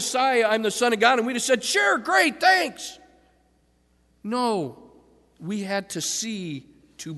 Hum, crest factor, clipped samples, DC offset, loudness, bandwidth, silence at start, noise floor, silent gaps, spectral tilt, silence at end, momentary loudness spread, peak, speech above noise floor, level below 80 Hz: none; 20 dB; under 0.1%; under 0.1%; -22 LUFS; 12.5 kHz; 0 s; -64 dBFS; none; -2.5 dB/octave; 0 s; 18 LU; -4 dBFS; 41 dB; -66 dBFS